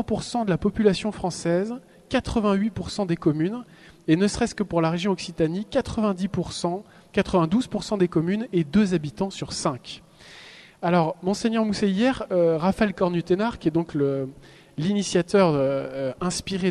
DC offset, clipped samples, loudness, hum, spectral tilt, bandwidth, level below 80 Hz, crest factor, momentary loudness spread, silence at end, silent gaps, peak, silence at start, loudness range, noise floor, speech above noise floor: under 0.1%; under 0.1%; -24 LUFS; none; -6 dB/octave; 12 kHz; -48 dBFS; 18 dB; 8 LU; 0 s; none; -6 dBFS; 0 s; 2 LU; -47 dBFS; 23 dB